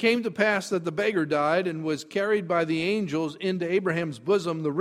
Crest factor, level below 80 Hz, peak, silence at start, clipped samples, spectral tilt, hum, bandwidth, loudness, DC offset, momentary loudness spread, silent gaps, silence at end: 18 dB; -68 dBFS; -8 dBFS; 0 s; under 0.1%; -5.5 dB/octave; none; 14 kHz; -26 LUFS; under 0.1%; 5 LU; none; 0 s